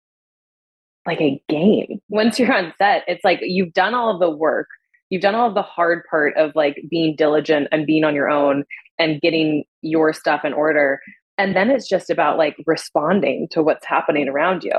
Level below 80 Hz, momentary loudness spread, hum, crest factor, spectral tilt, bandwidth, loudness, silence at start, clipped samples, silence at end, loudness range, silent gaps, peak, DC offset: -68 dBFS; 5 LU; none; 14 dB; -6 dB/octave; 12.5 kHz; -18 LUFS; 1.05 s; under 0.1%; 0 s; 1 LU; 2.03-2.09 s, 5.02-5.10 s, 8.91-8.98 s, 9.68-9.82 s, 11.22-11.38 s; -4 dBFS; under 0.1%